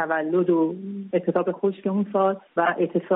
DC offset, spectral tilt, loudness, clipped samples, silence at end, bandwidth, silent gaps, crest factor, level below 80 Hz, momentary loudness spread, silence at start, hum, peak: under 0.1%; -3 dB/octave; -24 LUFS; under 0.1%; 0 s; 3.9 kHz; none; 14 dB; -74 dBFS; 5 LU; 0 s; none; -10 dBFS